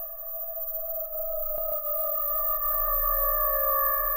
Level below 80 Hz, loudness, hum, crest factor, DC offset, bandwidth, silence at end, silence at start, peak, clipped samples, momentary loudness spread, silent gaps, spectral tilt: -40 dBFS; -25 LUFS; none; 16 dB; under 0.1%; 16 kHz; 0 s; 0 s; -12 dBFS; under 0.1%; 8 LU; none; -7 dB/octave